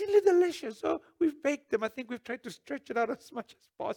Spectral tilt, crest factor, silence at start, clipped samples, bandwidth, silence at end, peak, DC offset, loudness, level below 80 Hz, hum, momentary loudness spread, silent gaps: -4.5 dB/octave; 18 dB; 0 s; under 0.1%; 16 kHz; 0 s; -12 dBFS; under 0.1%; -31 LUFS; -74 dBFS; none; 15 LU; none